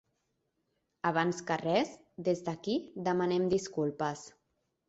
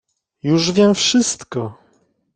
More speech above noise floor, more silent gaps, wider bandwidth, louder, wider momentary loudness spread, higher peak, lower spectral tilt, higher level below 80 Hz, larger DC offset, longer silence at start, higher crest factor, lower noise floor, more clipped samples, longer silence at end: first, 48 dB vs 44 dB; neither; second, 8 kHz vs 9.4 kHz; second, -33 LUFS vs -17 LUFS; second, 7 LU vs 13 LU; second, -14 dBFS vs -2 dBFS; first, -5.5 dB/octave vs -4 dB/octave; second, -70 dBFS vs -56 dBFS; neither; first, 1.05 s vs 0.45 s; about the same, 18 dB vs 16 dB; first, -80 dBFS vs -60 dBFS; neither; about the same, 0.6 s vs 0.65 s